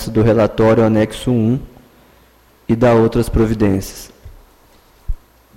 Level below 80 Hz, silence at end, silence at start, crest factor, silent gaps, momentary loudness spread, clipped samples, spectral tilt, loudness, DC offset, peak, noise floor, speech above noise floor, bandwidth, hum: -30 dBFS; 0.4 s; 0 s; 12 dB; none; 20 LU; under 0.1%; -7.5 dB/octave; -15 LUFS; under 0.1%; -4 dBFS; -50 dBFS; 36 dB; 16.5 kHz; none